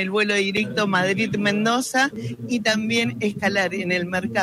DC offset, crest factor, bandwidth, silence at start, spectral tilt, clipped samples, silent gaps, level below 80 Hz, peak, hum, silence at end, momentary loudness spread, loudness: under 0.1%; 14 dB; 15 kHz; 0 s; -4 dB/octave; under 0.1%; none; -60 dBFS; -8 dBFS; none; 0 s; 4 LU; -21 LUFS